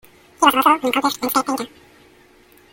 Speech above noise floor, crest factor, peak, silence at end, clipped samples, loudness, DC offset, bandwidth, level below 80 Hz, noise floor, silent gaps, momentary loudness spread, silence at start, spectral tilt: 33 dB; 20 dB; 0 dBFS; 1.05 s; under 0.1%; -18 LUFS; under 0.1%; 17 kHz; -60 dBFS; -51 dBFS; none; 12 LU; 0.4 s; -2 dB/octave